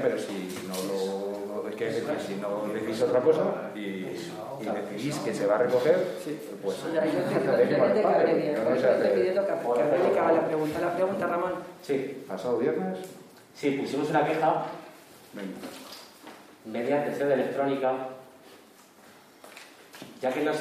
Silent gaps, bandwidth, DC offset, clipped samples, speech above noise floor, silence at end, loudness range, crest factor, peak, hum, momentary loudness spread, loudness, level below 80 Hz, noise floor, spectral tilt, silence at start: none; 15.5 kHz; under 0.1%; under 0.1%; 27 dB; 0 s; 7 LU; 18 dB; -10 dBFS; none; 18 LU; -27 LUFS; -72 dBFS; -54 dBFS; -6 dB/octave; 0 s